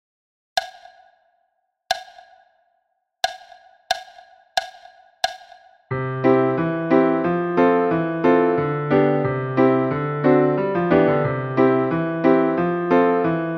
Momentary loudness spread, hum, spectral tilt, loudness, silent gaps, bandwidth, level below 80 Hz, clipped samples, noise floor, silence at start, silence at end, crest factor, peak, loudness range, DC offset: 10 LU; none; -6.5 dB/octave; -20 LUFS; none; 14.5 kHz; -56 dBFS; under 0.1%; -71 dBFS; 0.55 s; 0 s; 16 dB; -4 dBFS; 12 LU; under 0.1%